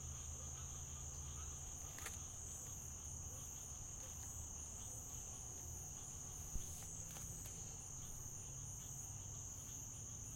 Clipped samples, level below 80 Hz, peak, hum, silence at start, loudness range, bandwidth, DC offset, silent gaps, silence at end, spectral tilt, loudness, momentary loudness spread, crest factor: under 0.1%; -58 dBFS; -30 dBFS; none; 0 s; 0 LU; 16.5 kHz; under 0.1%; none; 0 s; -2.5 dB/octave; -49 LUFS; 1 LU; 20 dB